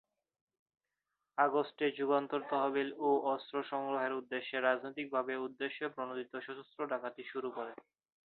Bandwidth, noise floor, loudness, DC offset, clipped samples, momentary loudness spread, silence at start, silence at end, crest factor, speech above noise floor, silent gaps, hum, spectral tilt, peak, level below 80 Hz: 4.4 kHz; -88 dBFS; -36 LUFS; under 0.1%; under 0.1%; 11 LU; 1.35 s; 0.55 s; 22 dB; 52 dB; none; none; -2 dB/octave; -16 dBFS; -88 dBFS